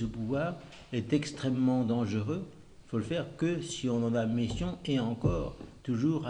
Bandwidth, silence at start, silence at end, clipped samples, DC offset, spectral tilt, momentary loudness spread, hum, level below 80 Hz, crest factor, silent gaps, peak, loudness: 10 kHz; 0 s; 0 s; under 0.1%; under 0.1%; -6.5 dB/octave; 8 LU; none; -50 dBFS; 18 dB; none; -14 dBFS; -32 LUFS